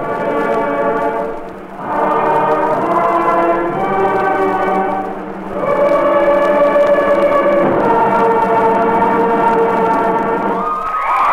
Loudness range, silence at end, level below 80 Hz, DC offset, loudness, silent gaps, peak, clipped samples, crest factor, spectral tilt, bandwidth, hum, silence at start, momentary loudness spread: 3 LU; 0 s; -42 dBFS; under 0.1%; -14 LUFS; none; 0 dBFS; under 0.1%; 12 dB; -7 dB/octave; 14.5 kHz; none; 0 s; 7 LU